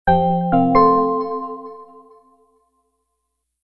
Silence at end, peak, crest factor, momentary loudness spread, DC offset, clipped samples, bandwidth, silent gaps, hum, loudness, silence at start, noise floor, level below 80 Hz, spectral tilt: 1.8 s; 0 dBFS; 20 dB; 19 LU; under 0.1%; under 0.1%; 5.6 kHz; none; 60 Hz at -60 dBFS; -17 LUFS; 0.05 s; -75 dBFS; -42 dBFS; -10.5 dB/octave